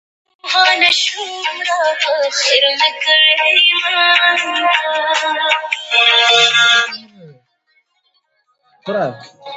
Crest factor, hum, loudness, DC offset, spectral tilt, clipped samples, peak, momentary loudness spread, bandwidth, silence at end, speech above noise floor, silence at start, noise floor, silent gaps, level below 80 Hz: 16 dB; none; -12 LUFS; under 0.1%; 0 dB/octave; under 0.1%; 0 dBFS; 12 LU; 10.5 kHz; 0 s; 49 dB; 0.45 s; -63 dBFS; none; -72 dBFS